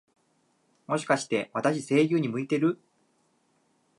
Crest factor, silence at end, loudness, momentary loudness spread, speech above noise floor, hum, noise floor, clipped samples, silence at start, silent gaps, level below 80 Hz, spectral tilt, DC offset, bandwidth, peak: 20 dB; 1.25 s; -27 LUFS; 8 LU; 44 dB; none; -70 dBFS; under 0.1%; 0.9 s; none; -80 dBFS; -5.5 dB/octave; under 0.1%; 11.5 kHz; -8 dBFS